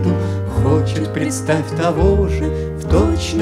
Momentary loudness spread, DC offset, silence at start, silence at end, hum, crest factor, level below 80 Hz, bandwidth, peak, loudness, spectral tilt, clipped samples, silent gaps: 5 LU; under 0.1%; 0 s; 0 s; none; 14 dB; -24 dBFS; 14 kHz; -2 dBFS; -17 LUFS; -6.5 dB/octave; under 0.1%; none